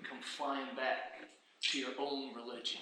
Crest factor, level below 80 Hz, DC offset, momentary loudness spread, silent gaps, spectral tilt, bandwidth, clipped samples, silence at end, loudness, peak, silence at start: 20 dB; under -90 dBFS; under 0.1%; 12 LU; none; -1 dB/octave; 12 kHz; under 0.1%; 0 s; -39 LUFS; -20 dBFS; 0 s